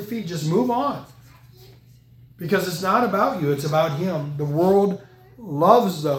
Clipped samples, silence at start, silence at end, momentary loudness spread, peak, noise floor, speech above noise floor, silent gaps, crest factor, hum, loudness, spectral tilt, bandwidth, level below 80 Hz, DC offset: under 0.1%; 0 s; 0 s; 14 LU; 0 dBFS; -50 dBFS; 29 dB; none; 20 dB; none; -21 LUFS; -6.5 dB/octave; 17.5 kHz; -58 dBFS; under 0.1%